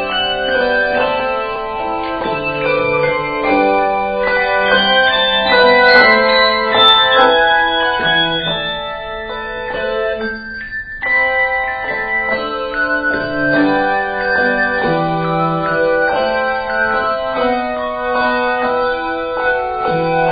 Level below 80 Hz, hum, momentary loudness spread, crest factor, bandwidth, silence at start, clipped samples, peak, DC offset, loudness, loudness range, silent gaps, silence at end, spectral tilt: -40 dBFS; none; 10 LU; 14 dB; 5.6 kHz; 0 s; under 0.1%; 0 dBFS; under 0.1%; -14 LUFS; 7 LU; none; 0 s; -1 dB/octave